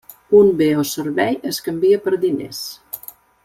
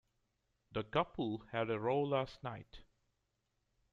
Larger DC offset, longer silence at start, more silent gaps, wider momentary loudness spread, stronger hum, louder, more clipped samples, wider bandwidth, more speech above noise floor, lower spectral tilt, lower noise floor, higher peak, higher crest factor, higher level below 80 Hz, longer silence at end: neither; second, 0.3 s vs 0.7 s; neither; first, 18 LU vs 12 LU; neither; first, -17 LUFS vs -38 LUFS; neither; first, 16.5 kHz vs 7.6 kHz; second, 20 dB vs 46 dB; second, -5 dB/octave vs -7.5 dB/octave; second, -37 dBFS vs -84 dBFS; first, -2 dBFS vs -20 dBFS; about the same, 16 dB vs 20 dB; first, -58 dBFS vs -66 dBFS; second, 0.5 s vs 1.1 s